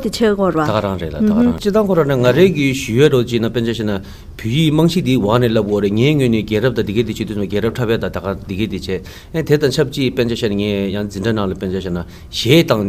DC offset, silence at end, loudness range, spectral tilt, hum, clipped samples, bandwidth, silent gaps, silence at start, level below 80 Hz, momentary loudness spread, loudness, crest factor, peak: under 0.1%; 0 s; 4 LU; -6.5 dB/octave; none; under 0.1%; 16 kHz; none; 0 s; -38 dBFS; 10 LU; -16 LUFS; 16 dB; 0 dBFS